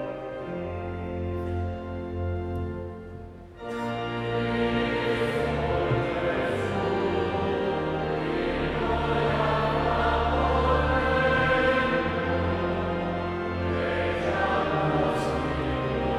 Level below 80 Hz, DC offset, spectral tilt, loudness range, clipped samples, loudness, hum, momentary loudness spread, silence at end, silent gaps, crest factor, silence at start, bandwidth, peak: -38 dBFS; under 0.1%; -7 dB/octave; 9 LU; under 0.1%; -27 LUFS; none; 10 LU; 0 s; none; 16 dB; 0 s; 12 kHz; -10 dBFS